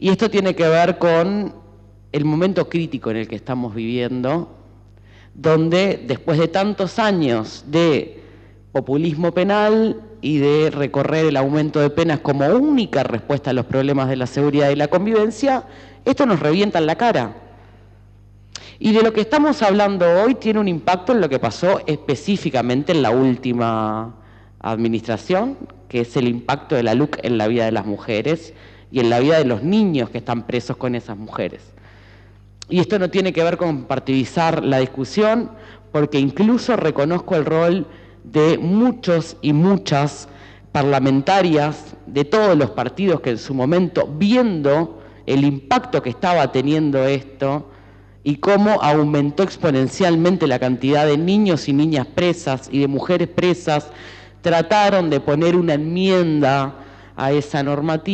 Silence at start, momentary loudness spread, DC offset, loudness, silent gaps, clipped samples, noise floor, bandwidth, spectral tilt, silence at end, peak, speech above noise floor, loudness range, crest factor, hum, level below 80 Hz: 0 s; 9 LU; under 0.1%; -18 LUFS; none; under 0.1%; -46 dBFS; 8.8 kHz; -7 dB/octave; 0 s; -4 dBFS; 28 dB; 4 LU; 14 dB; none; -50 dBFS